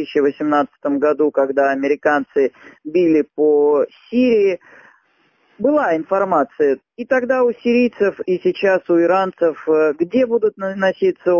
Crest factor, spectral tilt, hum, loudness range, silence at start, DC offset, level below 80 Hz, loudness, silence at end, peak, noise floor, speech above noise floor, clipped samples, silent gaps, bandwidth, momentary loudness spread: 14 dB; -7 dB/octave; none; 2 LU; 0 s; under 0.1%; -62 dBFS; -17 LUFS; 0 s; -4 dBFS; -60 dBFS; 43 dB; under 0.1%; none; 7 kHz; 5 LU